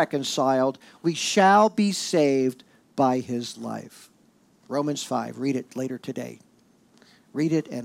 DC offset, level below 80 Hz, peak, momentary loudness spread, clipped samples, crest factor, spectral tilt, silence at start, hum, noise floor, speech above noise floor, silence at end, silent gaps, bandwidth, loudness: under 0.1%; -78 dBFS; -8 dBFS; 16 LU; under 0.1%; 18 dB; -4.5 dB/octave; 0 s; none; -60 dBFS; 36 dB; 0 s; none; 16 kHz; -24 LUFS